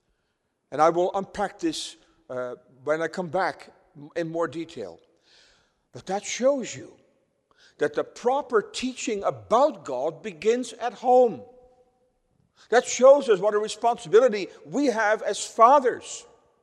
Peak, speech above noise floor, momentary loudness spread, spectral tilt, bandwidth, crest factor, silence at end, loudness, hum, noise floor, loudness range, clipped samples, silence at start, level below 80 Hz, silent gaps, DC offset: -4 dBFS; 51 dB; 18 LU; -3.5 dB/octave; 11.5 kHz; 22 dB; 0.4 s; -24 LUFS; none; -75 dBFS; 9 LU; under 0.1%; 0.7 s; -66 dBFS; none; under 0.1%